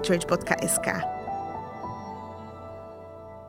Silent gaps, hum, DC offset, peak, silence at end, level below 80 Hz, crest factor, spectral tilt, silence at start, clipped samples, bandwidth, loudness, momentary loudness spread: none; none; under 0.1%; -4 dBFS; 0 s; -56 dBFS; 26 dB; -4 dB/octave; 0 s; under 0.1%; 16 kHz; -28 LUFS; 18 LU